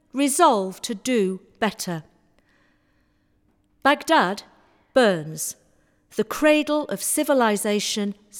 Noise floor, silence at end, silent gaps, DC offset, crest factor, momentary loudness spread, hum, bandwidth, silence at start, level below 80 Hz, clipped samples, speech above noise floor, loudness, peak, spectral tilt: -65 dBFS; 0 s; none; under 0.1%; 20 dB; 12 LU; none; 20 kHz; 0.15 s; -62 dBFS; under 0.1%; 43 dB; -22 LUFS; -4 dBFS; -3.5 dB/octave